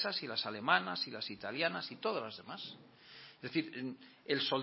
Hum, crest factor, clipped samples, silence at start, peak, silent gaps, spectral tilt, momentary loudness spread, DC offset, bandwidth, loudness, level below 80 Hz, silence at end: none; 24 dB; under 0.1%; 0 s; -14 dBFS; none; -7.5 dB/octave; 19 LU; under 0.1%; 5.8 kHz; -37 LUFS; -82 dBFS; 0 s